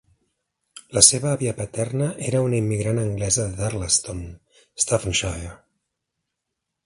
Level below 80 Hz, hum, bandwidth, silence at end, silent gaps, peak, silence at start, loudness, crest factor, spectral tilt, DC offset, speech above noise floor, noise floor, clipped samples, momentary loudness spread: -44 dBFS; none; 11.5 kHz; 1.3 s; none; 0 dBFS; 0.75 s; -21 LUFS; 24 dB; -3.5 dB/octave; under 0.1%; 59 dB; -81 dBFS; under 0.1%; 17 LU